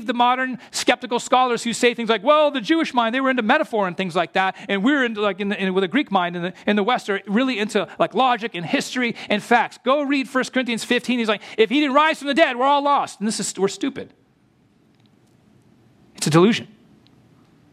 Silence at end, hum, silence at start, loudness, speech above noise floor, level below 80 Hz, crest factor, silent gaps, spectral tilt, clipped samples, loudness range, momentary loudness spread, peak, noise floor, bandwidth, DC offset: 1.05 s; none; 0 s; -20 LUFS; 39 dB; -70 dBFS; 18 dB; none; -4.5 dB/octave; under 0.1%; 5 LU; 7 LU; -2 dBFS; -59 dBFS; 14.5 kHz; under 0.1%